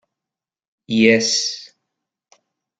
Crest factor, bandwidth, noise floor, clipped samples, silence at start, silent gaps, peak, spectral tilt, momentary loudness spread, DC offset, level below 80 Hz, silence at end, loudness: 20 dB; 9.2 kHz; -88 dBFS; under 0.1%; 0.9 s; none; -2 dBFS; -3 dB/octave; 12 LU; under 0.1%; -62 dBFS; 1.15 s; -16 LUFS